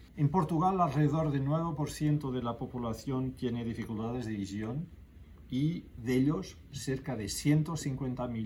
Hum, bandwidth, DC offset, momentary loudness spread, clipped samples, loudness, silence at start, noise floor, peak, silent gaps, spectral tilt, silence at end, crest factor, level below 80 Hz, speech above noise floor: none; 16.5 kHz; under 0.1%; 9 LU; under 0.1%; -33 LUFS; 0 s; -52 dBFS; -14 dBFS; none; -7 dB/octave; 0 s; 18 dB; -54 dBFS; 20 dB